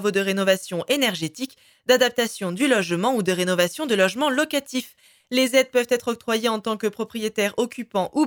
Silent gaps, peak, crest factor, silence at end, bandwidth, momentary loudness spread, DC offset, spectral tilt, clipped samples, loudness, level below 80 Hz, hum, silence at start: none; -4 dBFS; 18 dB; 0 s; 19.5 kHz; 9 LU; under 0.1%; -3.5 dB/octave; under 0.1%; -22 LUFS; -68 dBFS; none; 0 s